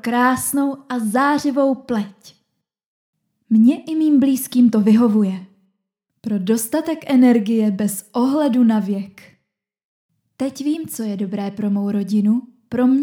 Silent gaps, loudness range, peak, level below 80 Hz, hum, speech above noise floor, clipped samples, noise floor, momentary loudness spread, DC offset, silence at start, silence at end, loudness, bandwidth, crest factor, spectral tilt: 2.86-3.13 s, 9.85-10.09 s; 6 LU; -4 dBFS; -64 dBFS; none; 58 dB; under 0.1%; -75 dBFS; 11 LU; under 0.1%; 0.05 s; 0 s; -18 LUFS; 19 kHz; 16 dB; -6 dB/octave